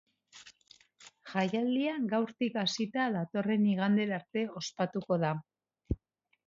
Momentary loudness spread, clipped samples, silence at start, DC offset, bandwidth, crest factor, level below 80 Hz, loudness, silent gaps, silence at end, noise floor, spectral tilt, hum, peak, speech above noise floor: 11 LU; under 0.1%; 0.35 s; under 0.1%; 7.6 kHz; 18 dB; -54 dBFS; -32 LUFS; none; 0.5 s; -71 dBFS; -6 dB/octave; none; -14 dBFS; 40 dB